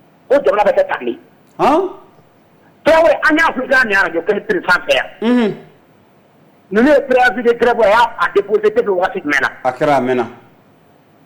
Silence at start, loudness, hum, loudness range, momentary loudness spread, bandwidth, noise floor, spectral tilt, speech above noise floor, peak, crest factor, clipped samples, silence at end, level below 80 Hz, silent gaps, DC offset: 0.3 s; -14 LUFS; none; 3 LU; 8 LU; 19 kHz; -49 dBFS; -5 dB/octave; 35 dB; -4 dBFS; 10 dB; under 0.1%; 0.9 s; -46 dBFS; none; under 0.1%